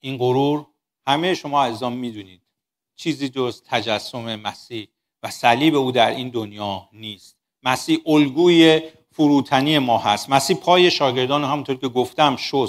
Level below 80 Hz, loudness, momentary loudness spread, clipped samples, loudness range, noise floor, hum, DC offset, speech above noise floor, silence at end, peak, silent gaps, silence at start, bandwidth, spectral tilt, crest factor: -64 dBFS; -19 LUFS; 16 LU; under 0.1%; 8 LU; -80 dBFS; none; under 0.1%; 61 dB; 0 s; 0 dBFS; none; 0.05 s; 15.5 kHz; -5 dB/octave; 20 dB